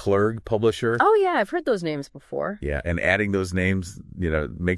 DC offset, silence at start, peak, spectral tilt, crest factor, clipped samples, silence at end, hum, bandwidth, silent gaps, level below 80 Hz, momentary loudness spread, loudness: under 0.1%; 0 s; -4 dBFS; -6.5 dB/octave; 18 dB; under 0.1%; 0 s; none; 12 kHz; none; -42 dBFS; 11 LU; -23 LUFS